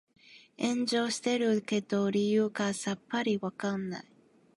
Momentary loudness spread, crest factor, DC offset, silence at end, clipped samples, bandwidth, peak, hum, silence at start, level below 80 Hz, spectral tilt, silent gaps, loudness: 7 LU; 16 dB; under 0.1%; 0.55 s; under 0.1%; 11.5 kHz; -16 dBFS; none; 0.3 s; -76 dBFS; -4.5 dB/octave; none; -31 LUFS